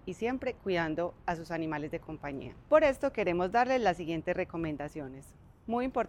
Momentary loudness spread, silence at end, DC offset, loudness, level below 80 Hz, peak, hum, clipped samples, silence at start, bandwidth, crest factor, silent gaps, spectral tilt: 14 LU; 0 s; under 0.1%; -32 LUFS; -56 dBFS; -12 dBFS; none; under 0.1%; 0.05 s; 16.5 kHz; 20 dB; none; -6.5 dB/octave